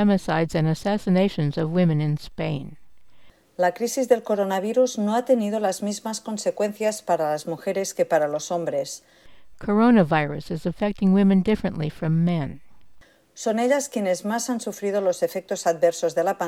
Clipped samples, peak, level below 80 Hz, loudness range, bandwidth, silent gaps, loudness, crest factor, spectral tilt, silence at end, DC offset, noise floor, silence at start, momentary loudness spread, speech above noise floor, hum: under 0.1%; -6 dBFS; -52 dBFS; 4 LU; 15.5 kHz; none; -23 LUFS; 18 dB; -6 dB/octave; 0 s; under 0.1%; -60 dBFS; 0 s; 9 LU; 37 dB; none